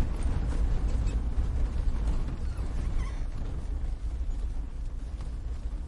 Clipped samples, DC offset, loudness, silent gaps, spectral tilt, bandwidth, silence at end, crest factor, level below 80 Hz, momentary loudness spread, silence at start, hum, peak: under 0.1%; under 0.1%; -34 LUFS; none; -7 dB/octave; 11 kHz; 0 s; 12 dB; -30 dBFS; 8 LU; 0 s; none; -16 dBFS